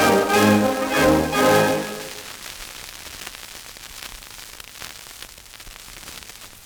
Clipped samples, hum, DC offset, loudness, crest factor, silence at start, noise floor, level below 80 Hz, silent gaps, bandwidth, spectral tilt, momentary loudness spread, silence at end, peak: under 0.1%; none; under 0.1%; -18 LUFS; 18 dB; 0 s; -41 dBFS; -48 dBFS; none; over 20 kHz; -4 dB/octave; 21 LU; 0.15 s; -4 dBFS